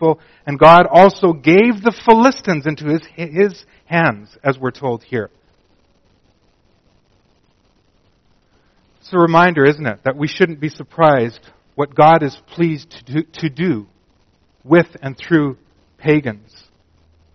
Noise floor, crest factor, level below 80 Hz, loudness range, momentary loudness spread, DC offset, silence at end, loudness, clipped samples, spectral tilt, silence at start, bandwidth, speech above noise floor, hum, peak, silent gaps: -57 dBFS; 16 dB; -52 dBFS; 11 LU; 14 LU; under 0.1%; 1 s; -15 LUFS; 0.1%; -5 dB/octave; 0 s; 6.6 kHz; 43 dB; none; 0 dBFS; none